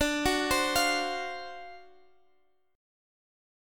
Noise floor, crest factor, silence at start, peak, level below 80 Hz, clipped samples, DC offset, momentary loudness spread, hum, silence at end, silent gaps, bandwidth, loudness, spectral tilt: -71 dBFS; 20 dB; 0 s; -12 dBFS; -52 dBFS; under 0.1%; under 0.1%; 18 LU; none; 1.9 s; none; 17.5 kHz; -28 LUFS; -2 dB/octave